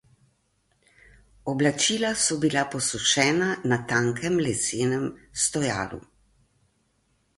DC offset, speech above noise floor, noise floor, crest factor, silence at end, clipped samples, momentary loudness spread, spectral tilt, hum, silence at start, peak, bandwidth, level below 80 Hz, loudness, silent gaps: under 0.1%; 44 dB; -69 dBFS; 22 dB; 1.35 s; under 0.1%; 10 LU; -3 dB/octave; none; 1.45 s; -6 dBFS; 11.5 kHz; -58 dBFS; -24 LUFS; none